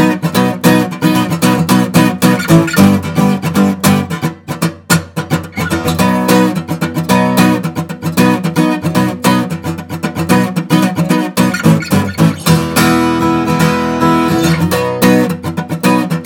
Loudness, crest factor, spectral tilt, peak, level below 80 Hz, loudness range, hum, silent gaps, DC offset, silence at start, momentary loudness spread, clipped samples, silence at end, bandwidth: -12 LUFS; 12 dB; -5.5 dB/octave; 0 dBFS; -46 dBFS; 3 LU; none; none; under 0.1%; 0 s; 8 LU; 0.2%; 0 s; 19 kHz